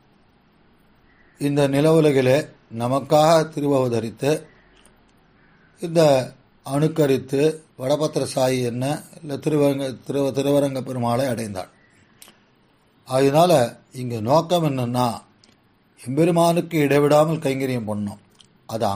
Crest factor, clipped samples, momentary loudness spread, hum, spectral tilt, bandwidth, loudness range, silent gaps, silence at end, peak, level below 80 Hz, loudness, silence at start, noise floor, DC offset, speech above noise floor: 18 dB; under 0.1%; 14 LU; none; -6 dB/octave; 15.5 kHz; 4 LU; none; 0 s; -4 dBFS; -60 dBFS; -20 LUFS; 1.4 s; -59 dBFS; under 0.1%; 39 dB